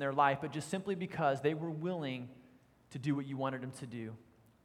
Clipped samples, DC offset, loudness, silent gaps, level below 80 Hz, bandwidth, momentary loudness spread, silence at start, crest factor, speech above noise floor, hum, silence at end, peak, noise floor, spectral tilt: under 0.1%; under 0.1%; -37 LUFS; none; -76 dBFS; 13.5 kHz; 15 LU; 0 s; 22 dB; 28 dB; none; 0.4 s; -16 dBFS; -64 dBFS; -6.5 dB/octave